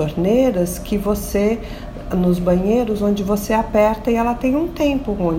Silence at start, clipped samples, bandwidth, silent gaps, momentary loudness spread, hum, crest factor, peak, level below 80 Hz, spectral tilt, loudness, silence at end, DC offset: 0 s; under 0.1%; 16.5 kHz; none; 6 LU; none; 14 dB; -4 dBFS; -32 dBFS; -6.5 dB/octave; -18 LUFS; 0 s; under 0.1%